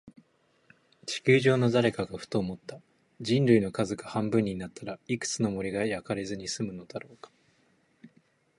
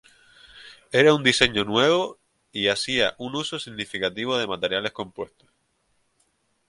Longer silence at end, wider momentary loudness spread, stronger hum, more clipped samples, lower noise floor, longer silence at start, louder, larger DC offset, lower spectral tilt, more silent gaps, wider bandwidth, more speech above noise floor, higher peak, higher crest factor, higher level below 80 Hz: second, 0.5 s vs 1.45 s; first, 18 LU vs 15 LU; neither; neither; about the same, -68 dBFS vs -69 dBFS; second, 0.05 s vs 0.55 s; second, -28 LUFS vs -22 LUFS; neither; first, -5.5 dB/octave vs -3.5 dB/octave; neither; about the same, 11.5 kHz vs 11.5 kHz; second, 39 dB vs 46 dB; second, -8 dBFS vs -2 dBFS; about the same, 22 dB vs 24 dB; about the same, -62 dBFS vs -58 dBFS